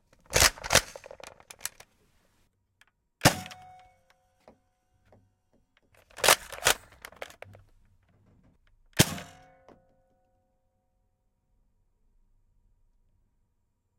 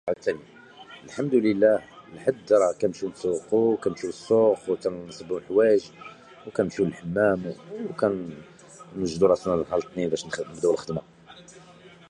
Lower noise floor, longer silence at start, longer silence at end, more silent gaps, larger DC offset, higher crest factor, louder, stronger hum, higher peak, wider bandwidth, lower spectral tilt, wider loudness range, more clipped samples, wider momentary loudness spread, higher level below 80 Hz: first, -75 dBFS vs -50 dBFS; first, 0.3 s vs 0.05 s; first, 4.75 s vs 0.7 s; neither; neither; first, 30 dB vs 18 dB; about the same, -25 LUFS vs -25 LUFS; neither; first, -4 dBFS vs -8 dBFS; first, 16.5 kHz vs 10.5 kHz; second, -2 dB/octave vs -6 dB/octave; about the same, 5 LU vs 3 LU; neither; first, 25 LU vs 18 LU; first, -52 dBFS vs -58 dBFS